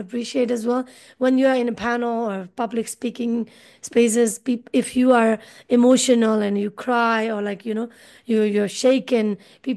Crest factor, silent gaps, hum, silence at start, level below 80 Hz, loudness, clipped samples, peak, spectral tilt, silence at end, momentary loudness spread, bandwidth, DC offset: 16 dB; none; none; 0 s; -64 dBFS; -21 LUFS; under 0.1%; -4 dBFS; -4.5 dB/octave; 0 s; 11 LU; 12.5 kHz; under 0.1%